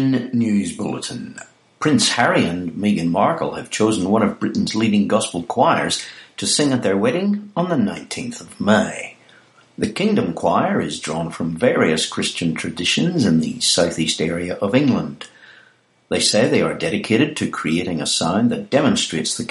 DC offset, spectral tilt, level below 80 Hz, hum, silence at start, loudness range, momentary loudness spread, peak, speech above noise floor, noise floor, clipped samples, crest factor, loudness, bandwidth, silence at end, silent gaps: under 0.1%; -4 dB/octave; -54 dBFS; none; 0 s; 3 LU; 9 LU; -2 dBFS; 36 dB; -54 dBFS; under 0.1%; 18 dB; -19 LUFS; 11.5 kHz; 0 s; none